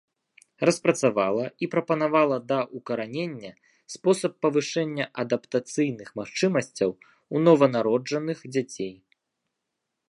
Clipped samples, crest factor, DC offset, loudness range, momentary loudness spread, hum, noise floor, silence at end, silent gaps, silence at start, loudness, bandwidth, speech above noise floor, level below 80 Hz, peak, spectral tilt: under 0.1%; 20 dB; under 0.1%; 3 LU; 11 LU; none; -82 dBFS; 1.15 s; none; 0.6 s; -25 LUFS; 11.5 kHz; 57 dB; -72 dBFS; -4 dBFS; -5.5 dB/octave